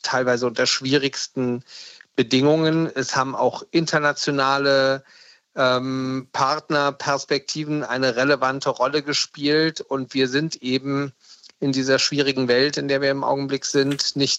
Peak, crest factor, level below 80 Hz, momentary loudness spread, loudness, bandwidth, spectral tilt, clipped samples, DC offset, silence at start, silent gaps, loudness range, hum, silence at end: -4 dBFS; 16 dB; -68 dBFS; 7 LU; -21 LUFS; 9 kHz; -4 dB/octave; under 0.1%; under 0.1%; 0.05 s; none; 2 LU; none; 0 s